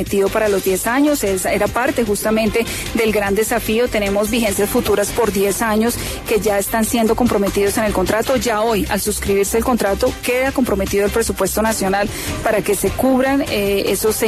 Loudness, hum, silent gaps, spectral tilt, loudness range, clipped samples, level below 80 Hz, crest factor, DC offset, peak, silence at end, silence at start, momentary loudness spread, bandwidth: -17 LUFS; none; none; -4 dB/octave; 1 LU; under 0.1%; -34 dBFS; 14 dB; under 0.1%; -2 dBFS; 0 s; 0 s; 2 LU; 14 kHz